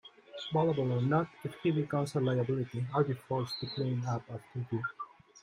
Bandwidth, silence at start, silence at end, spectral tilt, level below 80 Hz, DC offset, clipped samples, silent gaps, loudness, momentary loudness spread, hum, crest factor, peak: 12 kHz; 0.05 s; 0.05 s; -7.5 dB/octave; -70 dBFS; under 0.1%; under 0.1%; none; -33 LUFS; 11 LU; none; 18 dB; -16 dBFS